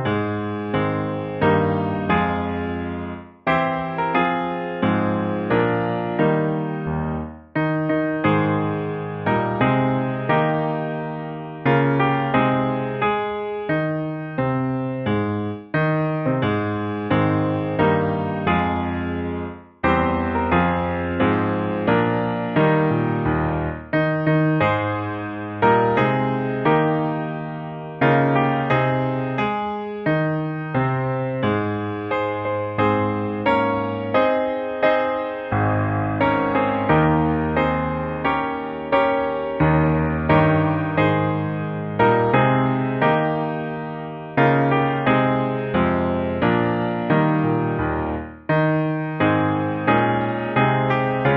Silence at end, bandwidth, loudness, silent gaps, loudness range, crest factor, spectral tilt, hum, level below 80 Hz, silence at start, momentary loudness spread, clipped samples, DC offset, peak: 0 s; 5.6 kHz; -21 LUFS; none; 3 LU; 18 dB; -6 dB/octave; none; -44 dBFS; 0 s; 8 LU; under 0.1%; under 0.1%; -2 dBFS